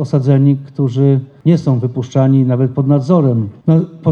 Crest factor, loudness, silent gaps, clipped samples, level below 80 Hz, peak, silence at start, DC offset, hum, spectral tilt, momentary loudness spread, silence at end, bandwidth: 12 dB; -13 LUFS; none; under 0.1%; -54 dBFS; 0 dBFS; 0 s; under 0.1%; none; -10 dB/octave; 5 LU; 0 s; 7 kHz